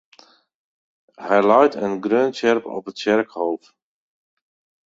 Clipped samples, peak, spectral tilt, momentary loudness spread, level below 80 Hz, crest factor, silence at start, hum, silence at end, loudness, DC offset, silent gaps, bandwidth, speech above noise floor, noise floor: under 0.1%; -2 dBFS; -5.5 dB/octave; 13 LU; -68 dBFS; 20 dB; 1.2 s; none; 1.3 s; -19 LUFS; under 0.1%; none; 7.8 kHz; 34 dB; -53 dBFS